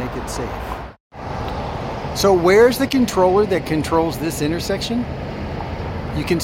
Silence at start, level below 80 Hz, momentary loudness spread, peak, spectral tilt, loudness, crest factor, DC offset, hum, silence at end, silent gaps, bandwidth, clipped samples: 0 s; -36 dBFS; 15 LU; -2 dBFS; -5.5 dB/octave; -19 LUFS; 16 dB; under 0.1%; none; 0 s; 1.00-1.10 s; 16.5 kHz; under 0.1%